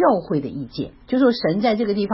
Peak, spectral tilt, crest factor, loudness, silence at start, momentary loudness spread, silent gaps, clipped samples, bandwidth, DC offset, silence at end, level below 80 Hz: -4 dBFS; -10.5 dB/octave; 16 dB; -21 LUFS; 0 s; 12 LU; none; under 0.1%; 5.8 kHz; under 0.1%; 0 s; -52 dBFS